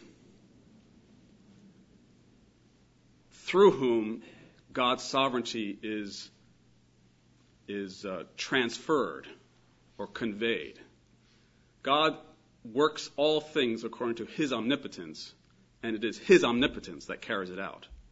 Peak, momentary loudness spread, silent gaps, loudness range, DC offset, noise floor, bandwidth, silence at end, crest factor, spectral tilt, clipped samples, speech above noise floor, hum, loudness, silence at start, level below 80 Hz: -8 dBFS; 20 LU; none; 6 LU; under 0.1%; -64 dBFS; 8 kHz; 0.1 s; 24 dB; -4.5 dB/octave; under 0.1%; 34 dB; none; -30 LUFS; 3.45 s; -64 dBFS